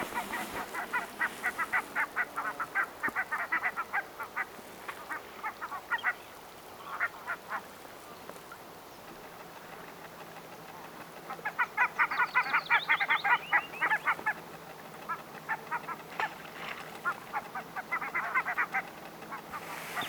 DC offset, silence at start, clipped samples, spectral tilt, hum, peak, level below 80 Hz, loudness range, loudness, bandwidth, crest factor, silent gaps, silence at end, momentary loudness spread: under 0.1%; 0 s; under 0.1%; -2.5 dB/octave; none; -12 dBFS; -70 dBFS; 12 LU; -33 LUFS; over 20 kHz; 22 dB; none; 0 s; 19 LU